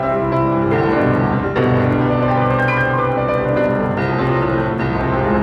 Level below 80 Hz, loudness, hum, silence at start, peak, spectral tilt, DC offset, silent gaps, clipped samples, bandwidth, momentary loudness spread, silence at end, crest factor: -34 dBFS; -16 LUFS; none; 0 s; -4 dBFS; -9 dB/octave; under 0.1%; none; under 0.1%; 5.8 kHz; 3 LU; 0 s; 12 dB